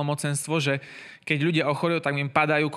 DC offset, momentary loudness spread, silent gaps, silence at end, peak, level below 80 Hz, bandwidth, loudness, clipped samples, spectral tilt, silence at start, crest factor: under 0.1%; 8 LU; none; 0 s; -6 dBFS; -70 dBFS; 14.5 kHz; -25 LUFS; under 0.1%; -5 dB/octave; 0 s; 20 dB